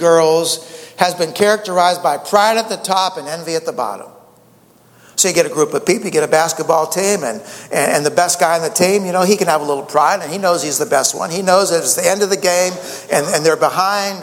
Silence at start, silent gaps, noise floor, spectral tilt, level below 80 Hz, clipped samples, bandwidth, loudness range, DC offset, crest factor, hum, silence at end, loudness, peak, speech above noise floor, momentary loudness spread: 0 s; none; -49 dBFS; -2.5 dB/octave; -64 dBFS; under 0.1%; 17 kHz; 4 LU; under 0.1%; 16 dB; none; 0 s; -15 LUFS; 0 dBFS; 34 dB; 8 LU